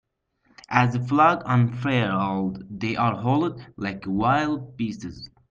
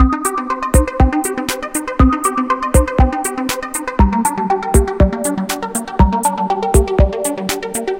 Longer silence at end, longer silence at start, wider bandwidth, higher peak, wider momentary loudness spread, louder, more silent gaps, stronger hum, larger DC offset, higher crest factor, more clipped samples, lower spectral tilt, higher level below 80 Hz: first, 0.25 s vs 0 s; first, 0.7 s vs 0 s; second, 7.4 kHz vs 17 kHz; second, -4 dBFS vs 0 dBFS; first, 12 LU vs 7 LU; second, -23 LUFS vs -16 LUFS; neither; neither; neither; first, 20 dB vs 14 dB; neither; first, -7.5 dB/octave vs -5.5 dB/octave; second, -56 dBFS vs -20 dBFS